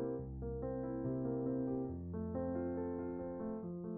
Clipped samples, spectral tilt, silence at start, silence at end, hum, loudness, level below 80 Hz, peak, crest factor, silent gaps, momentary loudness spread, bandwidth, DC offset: under 0.1%; -8.5 dB/octave; 0 s; 0 s; none; -41 LUFS; -56 dBFS; -28 dBFS; 12 dB; none; 5 LU; 2.4 kHz; under 0.1%